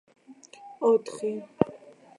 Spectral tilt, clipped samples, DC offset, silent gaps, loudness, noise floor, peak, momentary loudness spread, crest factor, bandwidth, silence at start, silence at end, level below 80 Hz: -7 dB/octave; under 0.1%; under 0.1%; none; -28 LUFS; -51 dBFS; -4 dBFS; 19 LU; 26 dB; 11.5 kHz; 0.3 s; 0.4 s; -68 dBFS